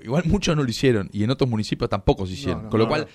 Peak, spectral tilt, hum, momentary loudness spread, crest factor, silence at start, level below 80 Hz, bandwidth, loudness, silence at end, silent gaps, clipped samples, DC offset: -6 dBFS; -6 dB/octave; none; 4 LU; 16 dB; 0 s; -38 dBFS; 14 kHz; -22 LUFS; 0.05 s; none; under 0.1%; under 0.1%